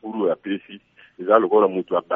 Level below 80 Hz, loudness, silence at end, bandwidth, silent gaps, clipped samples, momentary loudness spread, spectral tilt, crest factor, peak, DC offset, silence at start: -74 dBFS; -20 LUFS; 0 s; 3.7 kHz; none; under 0.1%; 14 LU; -4.5 dB/octave; 20 dB; 0 dBFS; under 0.1%; 0.05 s